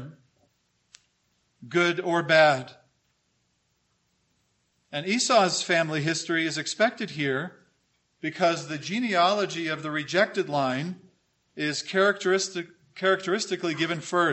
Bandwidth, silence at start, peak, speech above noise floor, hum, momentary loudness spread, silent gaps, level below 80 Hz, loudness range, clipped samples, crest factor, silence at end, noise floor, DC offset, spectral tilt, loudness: 8.6 kHz; 0 s; -4 dBFS; 47 dB; none; 12 LU; none; -76 dBFS; 2 LU; under 0.1%; 22 dB; 0 s; -72 dBFS; under 0.1%; -3.5 dB/octave; -25 LUFS